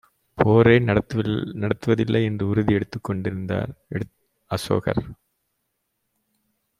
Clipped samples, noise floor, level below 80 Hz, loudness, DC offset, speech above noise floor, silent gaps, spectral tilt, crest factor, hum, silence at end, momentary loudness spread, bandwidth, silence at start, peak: under 0.1%; -76 dBFS; -50 dBFS; -22 LUFS; under 0.1%; 54 dB; none; -7.5 dB/octave; 20 dB; none; 1.65 s; 15 LU; 13.5 kHz; 0.35 s; -2 dBFS